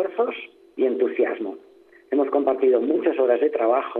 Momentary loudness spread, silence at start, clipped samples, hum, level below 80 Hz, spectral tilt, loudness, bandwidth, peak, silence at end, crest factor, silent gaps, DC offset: 11 LU; 0 s; under 0.1%; none; -80 dBFS; -7.5 dB/octave; -22 LUFS; 4 kHz; -8 dBFS; 0 s; 14 dB; none; under 0.1%